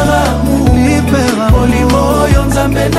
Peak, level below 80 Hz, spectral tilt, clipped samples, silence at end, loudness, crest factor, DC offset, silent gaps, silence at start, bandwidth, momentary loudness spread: 0 dBFS; -16 dBFS; -6 dB/octave; 0.2%; 0 s; -10 LUFS; 10 dB; under 0.1%; none; 0 s; 16 kHz; 2 LU